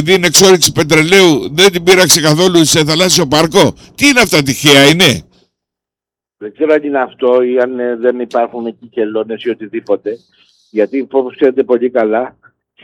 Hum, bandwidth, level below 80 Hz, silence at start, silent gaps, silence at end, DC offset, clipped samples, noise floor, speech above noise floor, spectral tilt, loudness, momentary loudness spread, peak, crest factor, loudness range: none; 19.5 kHz; -44 dBFS; 0 s; none; 0.55 s; under 0.1%; 0.2%; -87 dBFS; 76 dB; -3.5 dB/octave; -10 LUFS; 13 LU; 0 dBFS; 12 dB; 9 LU